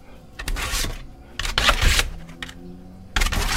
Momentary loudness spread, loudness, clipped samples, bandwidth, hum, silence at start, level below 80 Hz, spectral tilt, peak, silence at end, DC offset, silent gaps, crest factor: 22 LU; -22 LUFS; under 0.1%; 16 kHz; none; 0 s; -28 dBFS; -2 dB/octave; -4 dBFS; 0 s; under 0.1%; none; 20 dB